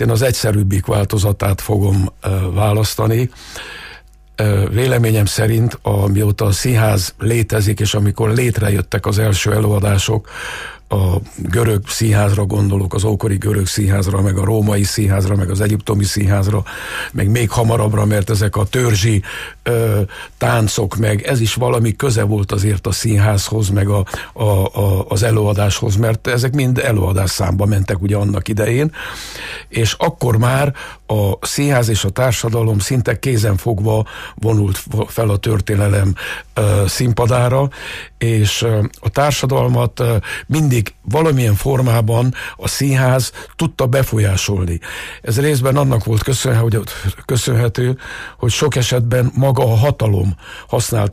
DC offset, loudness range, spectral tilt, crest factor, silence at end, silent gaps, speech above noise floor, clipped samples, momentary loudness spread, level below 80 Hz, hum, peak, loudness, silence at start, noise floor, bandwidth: under 0.1%; 2 LU; -5.5 dB/octave; 12 dB; 0 s; none; 25 dB; under 0.1%; 7 LU; -36 dBFS; none; -4 dBFS; -16 LUFS; 0 s; -40 dBFS; 15.5 kHz